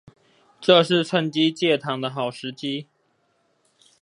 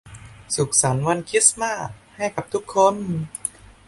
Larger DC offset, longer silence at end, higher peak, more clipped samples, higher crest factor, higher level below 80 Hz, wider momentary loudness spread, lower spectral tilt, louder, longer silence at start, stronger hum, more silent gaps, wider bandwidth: neither; first, 1.2 s vs 0.4 s; about the same, -2 dBFS vs -2 dBFS; neither; about the same, 22 dB vs 22 dB; second, -74 dBFS vs -52 dBFS; about the same, 13 LU vs 13 LU; first, -5.5 dB/octave vs -3.5 dB/octave; about the same, -22 LUFS vs -21 LUFS; first, 0.6 s vs 0.05 s; neither; neither; about the same, 11.5 kHz vs 12 kHz